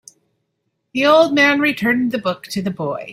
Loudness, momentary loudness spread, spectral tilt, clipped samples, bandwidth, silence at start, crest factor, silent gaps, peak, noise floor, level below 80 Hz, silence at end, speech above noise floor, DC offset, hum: -16 LUFS; 12 LU; -5 dB/octave; under 0.1%; 16 kHz; 0.95 s; 16 dB; none; -2 dBFS; -72 dBFS; -60 dBFS; 0 s; 56 dB; under 0.1%; none